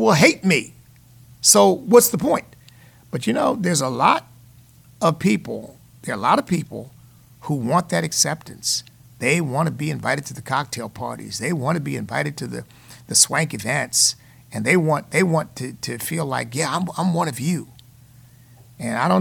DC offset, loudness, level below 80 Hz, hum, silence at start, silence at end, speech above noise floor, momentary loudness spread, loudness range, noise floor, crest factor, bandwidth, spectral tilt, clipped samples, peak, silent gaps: under 0.1%; -20 LUFS; -58 dBFS; none; 0 s; 0 s; 29 dB; 16 LU; 6 LU; -49 dBFS; 20 dB; 19 kHz; -3.5 dB/octave; under 0.1%; -2 dBFS; none